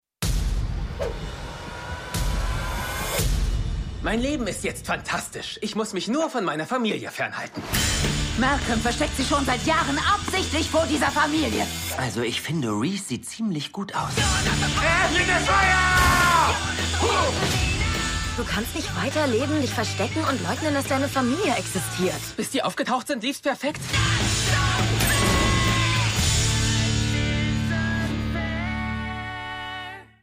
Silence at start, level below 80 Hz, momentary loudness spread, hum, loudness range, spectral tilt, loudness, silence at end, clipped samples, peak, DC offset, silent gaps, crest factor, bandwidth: 0.2 s; -34 dBFS; 10 LU; none; 7 LU; -4 dB/octave; -23 LUFS; 0.2 s; under 0.1%; -6 dBFS; under 0.1%; none; 18 dB; 16 kHz